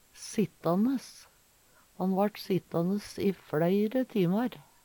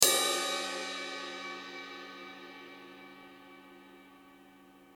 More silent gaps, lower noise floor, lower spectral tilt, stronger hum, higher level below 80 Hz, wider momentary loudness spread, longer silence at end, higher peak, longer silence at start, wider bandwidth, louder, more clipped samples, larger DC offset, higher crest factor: neither; first, -63 dBFS vs -58 dBFS; first, -7 dB/octave vs 0.5 dB/octave; neither; first, -68 dBFS vs -78 dBFS; second, 7 LU vs 25 LU; first, 0.25 s vs 0.05 s; second, -16 dBFS vs -2 dBFS; first, 0.15 s vs 0 s; about the same, 19 kHz vs 19 kHz; first, -30 LUFS vs -34 LUFS; neither; neither; second, 14 dB vs 36 dB